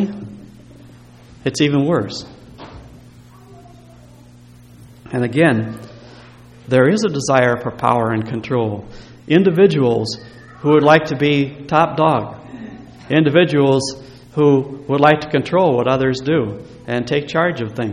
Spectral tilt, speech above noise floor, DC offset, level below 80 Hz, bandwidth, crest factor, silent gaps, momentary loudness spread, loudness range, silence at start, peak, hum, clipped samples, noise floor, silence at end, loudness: -6 dB/octave; 27 dB; under 0.1%; -50 dBFS; 11.5 kHz; 18 dB; none; 18 LU; 8 LU; 0 s; 0 dBFS; none; under 0.1%; -43 dBFS; 0 s; -16 LUFS